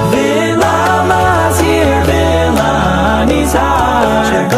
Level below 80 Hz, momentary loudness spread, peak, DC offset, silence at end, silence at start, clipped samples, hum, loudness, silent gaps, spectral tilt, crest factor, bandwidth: -22 dBFS; 1 LU; 0 dBFS; under 0.1%; 0 s; 0 s; under 0.1%; none; -11 LUFS; none; -5 dB/octave; 10 dB; 15.5 kHz